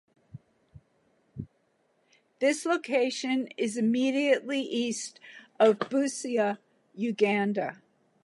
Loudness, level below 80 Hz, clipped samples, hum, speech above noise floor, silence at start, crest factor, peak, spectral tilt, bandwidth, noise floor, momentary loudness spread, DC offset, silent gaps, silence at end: -28 LUFS; -70 dBFS; under 0.1%; none; 44 dB; 0.35 s; 20 dB; -10 dBFS; -4.5 dB/octave; 11.5 kHz; -71 dBFS; 20 LU; under 0.1%; none; 0.5 s